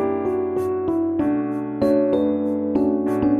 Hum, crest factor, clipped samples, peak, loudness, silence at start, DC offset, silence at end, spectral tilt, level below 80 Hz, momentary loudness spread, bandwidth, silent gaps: none; 14 dB; under 0.1%; -6 dBFS; -21 LUFS; 0 s; under 0.1%; 0 s; -9 dB/octave; -50 dBFS; 4 LU; 4.5 kHz; none